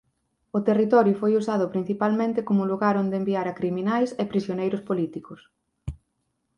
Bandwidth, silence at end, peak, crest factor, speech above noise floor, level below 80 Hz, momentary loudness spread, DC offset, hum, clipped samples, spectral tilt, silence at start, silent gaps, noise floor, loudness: 9.6 kHz; 0.65 s; -6 dBFS; 18 dB; 52 dB; -52 dBFS; 12 LU; under 0.1%; none; under 0.1%; -8 dB/octave; 0.55 s; none; -75 dBFS; -24 LUFS